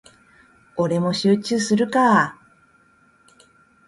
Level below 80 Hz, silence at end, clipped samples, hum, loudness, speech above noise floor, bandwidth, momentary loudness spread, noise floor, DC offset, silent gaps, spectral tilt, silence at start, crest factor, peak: -62 dBFS; 1.55 s; under 0.1%; none; -19 LUFS; 38 dB; 11.5 kHz; 9 LU; -57 dBFS; under 0.1%; none; -5 dB/octave; 0.75 s; 18 dB; -4 dBFS